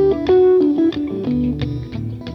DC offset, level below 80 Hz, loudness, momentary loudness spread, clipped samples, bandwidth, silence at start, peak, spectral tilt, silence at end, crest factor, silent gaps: under 0.1%; -38 dBFS; -17 LUFS; 13 LU; under 0.1%; 6 kHz; 0 s; -6 dBFS; -9.5 dB/octave; 0 s; 10 dB; none